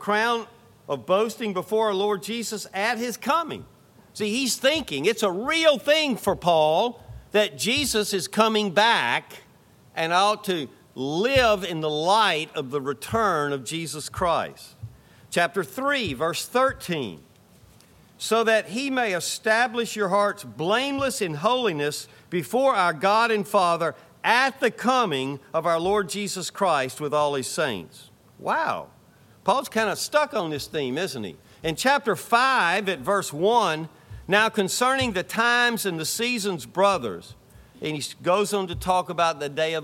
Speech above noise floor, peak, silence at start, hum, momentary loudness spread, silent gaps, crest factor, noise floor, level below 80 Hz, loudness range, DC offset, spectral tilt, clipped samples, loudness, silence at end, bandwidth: 31 dB; -4 dBFS; 0 s; none; 10 LU; none; 20 dB; -54 dBFS; -54 dBFS; 4 LU; under 0.1%; -3.5 dB/octave; under 0.1%; -23 LUFS; 0 s; 16.5 kHz